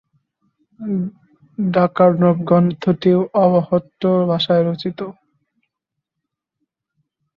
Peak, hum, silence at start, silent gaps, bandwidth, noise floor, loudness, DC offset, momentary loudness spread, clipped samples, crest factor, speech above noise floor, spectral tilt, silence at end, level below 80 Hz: -2 dBFS; none; 0.8 s; none; 5.6 kHz; -81 dBFS; -17 LUFS; under 0.1%; 14 LU; under 0.1%; 16 dB; 65 dB; -9.5 dB/octave; 2.25 s; -60 dBFS